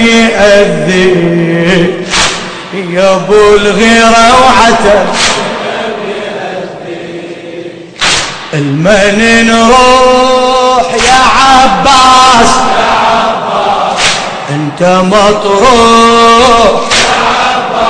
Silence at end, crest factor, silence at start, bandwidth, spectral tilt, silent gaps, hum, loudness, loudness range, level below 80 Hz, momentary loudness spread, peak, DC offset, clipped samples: 0 s; 6 dB; 0 s; 11 kHz; -3.5 dB/octave; none; none; -6 LUFS; 7 LU; -28 dBFS; 13 LU; 0 dBFS; under 0.1%; 7%